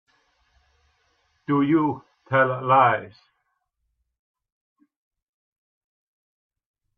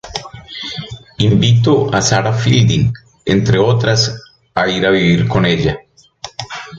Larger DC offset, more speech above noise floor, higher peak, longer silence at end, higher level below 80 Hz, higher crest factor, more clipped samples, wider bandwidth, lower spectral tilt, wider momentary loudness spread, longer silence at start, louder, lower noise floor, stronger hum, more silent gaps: neither; first, 55 dB vs 23 dB; second, -4 dBFS vs 0 dBFS; first, 3.9 s vs 0 s; second, -70 dBFS vs -38 dBFS; first, 24 dB vs 14 dB; neither; second, 4.8 kHz vs 7.8 kHz; first, -9.5 dB/octave vs -5.5 dB/octave; second, 13 LU vs 16 LU; first, 1.5 s vs 0.05 s; second, -21 LUFS vs -14 LUFS; first, -76 dBFS vs -35 dBFS; neither; neither